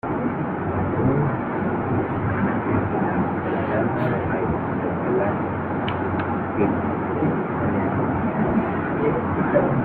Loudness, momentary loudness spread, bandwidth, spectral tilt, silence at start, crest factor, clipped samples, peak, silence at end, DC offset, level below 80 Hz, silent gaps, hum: -23 LUFS; 4 LU; 4.4 kHz; -11.5 dB/octave; 0.05 s; 16 dB; under 0.1%; -6 dBFS; 0 s; under 0.1%; -46 dBFS; none; none